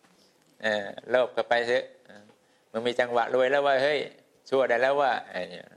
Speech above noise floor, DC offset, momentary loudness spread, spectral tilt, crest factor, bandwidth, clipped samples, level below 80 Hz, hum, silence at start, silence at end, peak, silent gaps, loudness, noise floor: 36 dB; under 0.1%; 11 LU; -4 dB/octave; 18 dB; 11 kHz; under 0.1%; -78 dBFS; none; 0.6 s; 0.15 s; -8 dBFS; none; -26 LUFS; -62 dBFS